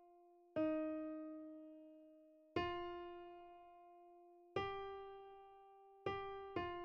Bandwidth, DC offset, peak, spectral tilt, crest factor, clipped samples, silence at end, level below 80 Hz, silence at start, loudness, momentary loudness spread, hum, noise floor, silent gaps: 6.8 kHz; under 0.1%; -26 dBFS; -4 dB/octave; 22 dB; under 0.1%; 0 s; -72 dBFS; 0 s; -47 LUFS; 21 LU; none; -68 dBFS; none